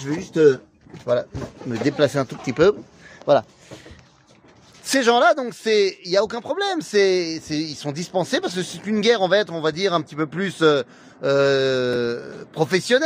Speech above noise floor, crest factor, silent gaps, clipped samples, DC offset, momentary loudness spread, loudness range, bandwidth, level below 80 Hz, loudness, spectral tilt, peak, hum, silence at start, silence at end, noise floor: 32 dB; 18 dB; none; under 0.1%; under 0.1%; 11 LU; 3 LU; 15.5 kHz; -56 dBFS; -21 LUFS; -4.5 dB/octave; -4 dBFS; none; 0 s; 0 s; -52 dBFS